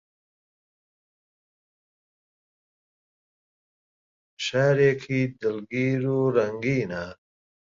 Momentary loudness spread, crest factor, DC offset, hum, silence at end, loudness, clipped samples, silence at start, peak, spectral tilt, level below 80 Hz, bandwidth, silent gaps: 11 LU; 20 dB; under 0.1%; none; 0.55 s; -25 LUFS; under 0.1%; 4.4 s; -8 dBFS; -6.5 dB/octave; -62 dBFS; 7.6 kHz; none